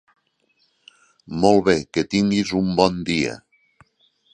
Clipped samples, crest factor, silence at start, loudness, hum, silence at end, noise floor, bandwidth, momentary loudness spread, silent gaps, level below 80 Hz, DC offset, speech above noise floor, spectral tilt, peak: under 0.1%; 22 dB; 1.3 s; -20 LUFS; none; 0.95 s; -66 dBFS; 10 kHz; 9 LU; none; -50 dBFS; under 0.1%; 47 dB; -5.5 dB/octave; 0 dBFS